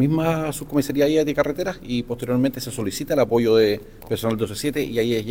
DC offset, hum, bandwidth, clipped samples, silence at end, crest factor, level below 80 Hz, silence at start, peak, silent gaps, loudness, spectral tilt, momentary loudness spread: under 0.1%; none; 17.5 kHz; under 0.1%; 0 s; 16 dB; -46 dBFS; 0 s; -6 dBFS; none; -22 LUFS; -6 dB/octave; 9 LU